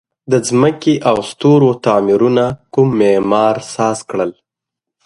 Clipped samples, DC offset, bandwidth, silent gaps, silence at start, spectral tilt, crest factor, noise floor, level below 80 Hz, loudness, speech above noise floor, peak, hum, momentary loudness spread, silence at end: under 0.1%; under 0.1%; 11.5 kHz; none; 0.3 s; -6 dB/octave; 14 dB; -82 dBFS; -52 dBFS; -14 LUFS; 69 dB; 0 dBFS; none; 6 LU; 0.75 s